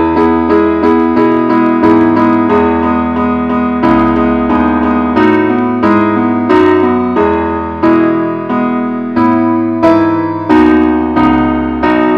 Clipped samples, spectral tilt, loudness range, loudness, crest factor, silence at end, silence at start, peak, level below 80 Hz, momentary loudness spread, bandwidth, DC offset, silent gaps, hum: under 0.1%; -8.5 dB/octave; 2 LU; -10 LUFS; 10 dB; 0 s; 0 s; 0 dBFS; -32 dBFS; 5 LU; 5.6 kHz; 0.4%; none; none